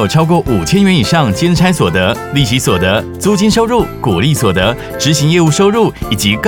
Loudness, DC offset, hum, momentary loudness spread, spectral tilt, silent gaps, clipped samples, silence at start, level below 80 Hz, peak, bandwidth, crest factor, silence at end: -11 LUFS; 0.2%; none; 4 LU; -5 dB/octave; none; under 0.1%; 0 s; -32 dBFS; 0 dBFS; 19 kHz; 10 dB; 0 s